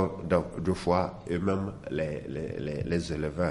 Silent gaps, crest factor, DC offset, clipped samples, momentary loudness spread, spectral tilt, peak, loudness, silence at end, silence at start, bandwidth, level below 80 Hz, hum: none; 18 dB; under 0.1%; under 0.1%; 7 LU; -7 dB/octave; -10 dBFS; -31 LUFS; 0 s; 0 s; 11.5 kHz; -48 dBFS; none